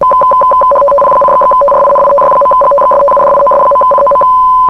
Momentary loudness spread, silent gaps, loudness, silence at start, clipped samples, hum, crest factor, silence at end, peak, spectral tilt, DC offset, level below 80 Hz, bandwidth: 0 LU; none; -6 LUFS; 0 s; under 0.1%; none; 6 dB; 0 s; 0 dBFS; -6.5 dB/octave; under 0.1%; -38 dBFS; 10.5 kHz